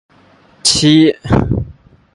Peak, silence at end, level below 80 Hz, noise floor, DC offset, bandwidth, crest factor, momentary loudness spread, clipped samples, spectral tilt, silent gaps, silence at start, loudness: 0 dBFS; 0.4 s; -30 dBFS; -48 dBFS; under 0.1%; 11.5 kHz; 14 dB; 12 LU; under 0.1%; -4.5 dB/octave; none; 0.65 s; -12 LUFS